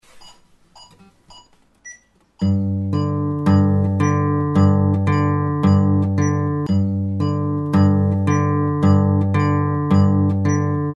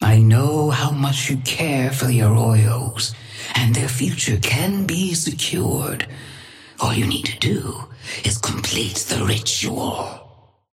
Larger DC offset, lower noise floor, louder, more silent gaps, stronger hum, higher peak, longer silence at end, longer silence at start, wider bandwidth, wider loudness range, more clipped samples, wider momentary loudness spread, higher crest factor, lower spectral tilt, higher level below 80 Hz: neither; about the same, -50 dBFS vs -49 dBFS; about the same, -18 LUFS vs -19 LUFS; neither; neither; about the same, -4 dBFS vs -4 dBFS; second, 0 s vs 0.5 s; first, 0.15 s vs 0 s; second, 7.2 kHz vs 16 kHz; about the same, 5 LU vs 4 LU; neither; second, 6 LU vs 12 LU; about the same, 14 dB vs 16 dB; first, -8.5 dB/octave vs -4.5 dB/octave; about the same, -52 dBFS vs -48 dBFS